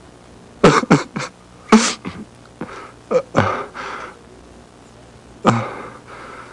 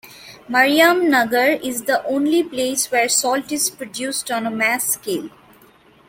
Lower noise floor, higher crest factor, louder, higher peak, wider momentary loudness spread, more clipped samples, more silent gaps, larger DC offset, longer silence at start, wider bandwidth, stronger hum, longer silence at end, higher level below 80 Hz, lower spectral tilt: second, -43 dBFS vs -50 dBFS; about the same, 18 dB vs 18 dB; about the same, -18 LUFS vs -18 LUFS; about the same, -2 dBFS vs -2 dBFS; first, 22 LU vs 10 LU; neither; neither; neither; first, 0.6 s vs 0.05 s; second, 11.5 kHz vs 17 kHz; neither; second, 0 s vs 0.8 s; first, -48 dBFS vs -62 dBFS; first, -5 dB/octave vs -1.5 dB/octave